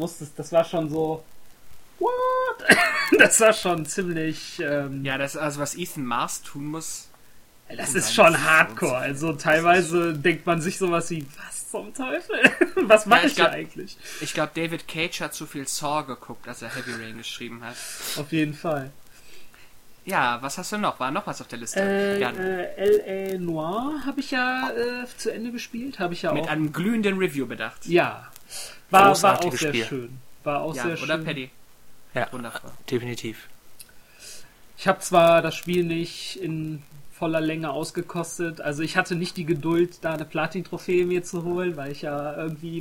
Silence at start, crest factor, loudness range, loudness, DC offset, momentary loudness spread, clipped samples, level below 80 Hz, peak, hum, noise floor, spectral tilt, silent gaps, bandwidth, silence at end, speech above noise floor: 0 s; 24 dB; 10 LU; -23 LUFS; under 0.1%; 17 LU; under 0.1%; -58 dBFS; 0 dBFS; none; -49 dBFS; -4 dB/octave; none; 17 kHz; 0 s; 25 dB